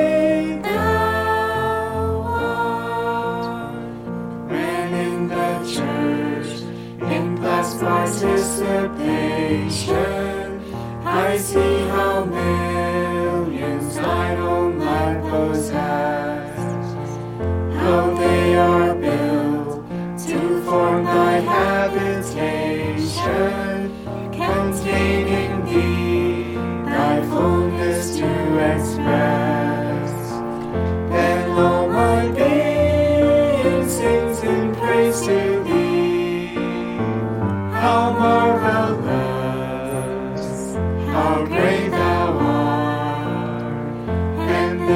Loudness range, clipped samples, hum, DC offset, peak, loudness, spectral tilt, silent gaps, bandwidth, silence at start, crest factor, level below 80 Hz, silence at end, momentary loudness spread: 5 LU; under 0.1%; none; under 0.1%; -2 dBFS; -20 LUFS; -6 dB/octave; none; 16.5 kHz; 0 s; 16 dB; -40 dBFS; 0 s; 9 LU